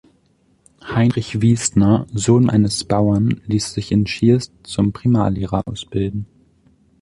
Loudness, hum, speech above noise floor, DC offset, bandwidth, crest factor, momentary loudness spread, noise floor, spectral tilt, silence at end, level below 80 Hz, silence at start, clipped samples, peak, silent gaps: -18 LUFS; none; 42 dB; under 0.1%; 11.5 kHz; 16 dB; 9 LU; -59 dBFS; -6 dB/octave; 0.8 s; -40 dBFS; 0.85 s; under 0.1%; -2 dBFS; none